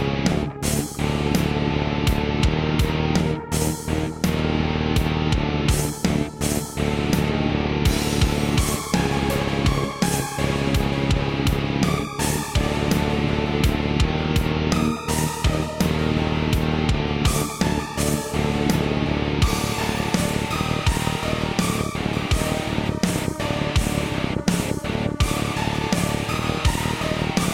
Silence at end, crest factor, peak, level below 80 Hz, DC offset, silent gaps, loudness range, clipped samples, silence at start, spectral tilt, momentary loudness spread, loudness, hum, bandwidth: 0 s; 14 dB; -8 dBFS; -30 dBFS; under 0.1%; none; 1 LU; under 0.1%; 0 s; -5 dB/octave; 3 LU; -22 LUFS; none; 16.5 kHz